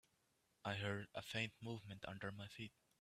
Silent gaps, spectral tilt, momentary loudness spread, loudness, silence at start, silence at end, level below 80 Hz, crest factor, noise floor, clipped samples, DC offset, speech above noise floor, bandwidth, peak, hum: none; -5 dB/octave; 8 LU; -48 LUFS; 0.65 s; 0.3 s; -78 dBFS; 22 dB; -82 dBFS; under 0.1%; under 0.1%; 34 dB; 14.5 kHz; -28 dBFS; none